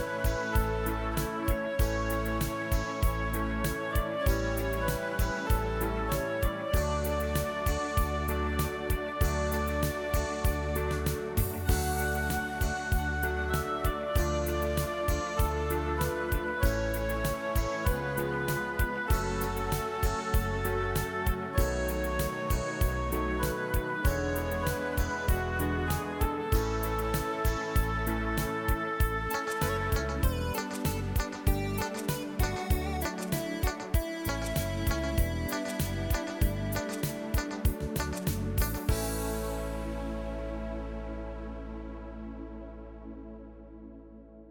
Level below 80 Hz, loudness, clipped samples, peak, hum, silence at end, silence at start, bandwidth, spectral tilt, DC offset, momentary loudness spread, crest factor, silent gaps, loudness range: -34 dBFS; -31 LUFS; under 0.1%; -12 dBFS; none; 0 s; 0 s; over 20 kHz; -5.5 dB/octave; under 0.1%; 6 LU; 18 dB; none; 2 LU